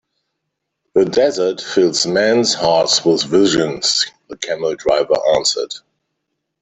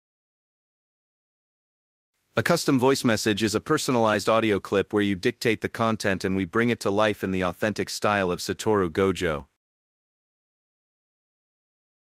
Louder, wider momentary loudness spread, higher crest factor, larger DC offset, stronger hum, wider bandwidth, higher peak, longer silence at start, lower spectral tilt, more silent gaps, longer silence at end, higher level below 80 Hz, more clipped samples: first, -15 LUFS vs -24 LUFS; about the same, 8 LU vs 6 LU; about the same, 16 dB vs 20 dB; neither; neither; second, 8.4 kHz vs 16 kHz; first, 0 dBFS vs -6 dBFS; second, 0.95 s vs 2.35 s; second, -3 dB/octave vs -5 dB/octave; neither; second, 0.85 s vs 2.75 s; first, -54 dBFS vs -60 dBFS; neither